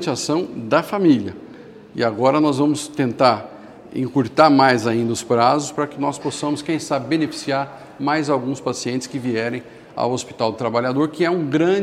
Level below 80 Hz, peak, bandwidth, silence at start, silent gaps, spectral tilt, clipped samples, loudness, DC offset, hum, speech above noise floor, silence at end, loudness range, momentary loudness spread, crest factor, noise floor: -62 dBFS; 0 dBFS; 13.5 kHz; 0 s; none; -5.5 dB/octave; under 0.1%; -19 LUFS; under 0.1%; none; 21 dB; 0 s; 5 LU; 10 LU; 20 dB; -40 dBFS